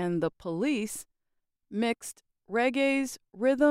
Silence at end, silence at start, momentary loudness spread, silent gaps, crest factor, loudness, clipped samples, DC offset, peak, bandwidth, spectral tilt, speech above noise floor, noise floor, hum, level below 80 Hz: 0 s; 0 s; 12 LU; none; 18 dB; -30 LUFS; under 0.1%; under 0.1%; -12 dBFS; 16 kHz; -5 dB/octave; 51 dB; -80 dBFS; none; -66 dBFS